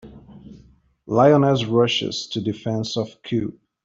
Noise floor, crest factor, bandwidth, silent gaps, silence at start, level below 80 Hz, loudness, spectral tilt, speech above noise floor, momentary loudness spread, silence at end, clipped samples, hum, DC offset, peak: -53 dBFS; 18 dB; 7.8 kHz; none; 0.05 s; -56 dBFS; -20 LUFS; -6 dB/octave; 33 dB; 11 LU; 0.35 s; under 0.1%; none; under 0.1%; -4 dBFS